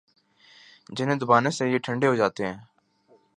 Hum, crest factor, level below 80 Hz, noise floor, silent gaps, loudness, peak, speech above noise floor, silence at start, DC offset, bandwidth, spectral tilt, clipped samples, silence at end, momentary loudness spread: none; 22 dB; -66 dBFS; -61 dBFS; none; -24 LUFS; -4 dBFS; 38 dB; 0.9 s; under 0.1%; 10.5 kHz; -5.5 dB/octave; under 0.1%; 0.75 s; 12 LU